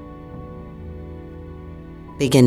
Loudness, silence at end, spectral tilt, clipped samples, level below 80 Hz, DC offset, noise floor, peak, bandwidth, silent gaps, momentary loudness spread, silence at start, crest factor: -30 LUFS; 0 s; -6 dB/octave; under 0.1%; -42 dBFS; under 0.1%; -37 dBFS; -2 dBFS; 15 kHz; none; 13 LU; 0 s; 20 dB